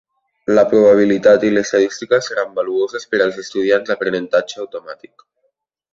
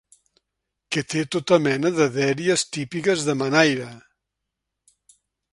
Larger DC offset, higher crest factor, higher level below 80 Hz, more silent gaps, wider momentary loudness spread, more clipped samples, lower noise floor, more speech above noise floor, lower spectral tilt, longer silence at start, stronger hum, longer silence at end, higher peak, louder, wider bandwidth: neither; second, 16 dB vs 24 dB; first, -58 dBFS vs -64 dBFS; neither; first, 17 LU vs 9 LU; neither; second, -68 dBFS vs -82 dBFS; second, 53 dB vs 61 dB; about the same, -5 dB/octave vs -4.5 dB/octave; second, 0.5 s vs 0.9 s; neither; second, 1 s vs 1.55 s; about the same, -2 dBFS vs 0 dBFS; first, -15 LUFS vs -21 LUFS; second, 7.6 kHz vs 11.5 kHz